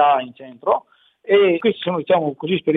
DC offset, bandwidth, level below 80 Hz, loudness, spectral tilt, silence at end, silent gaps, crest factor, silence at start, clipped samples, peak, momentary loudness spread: under 0.1%; 4 kHz; -66 dBFS; -19 LUFS; -9 dB/octave; 0 s; none; 16 dB; 0 s; under 0.1%; -4 dBFS; 11 LU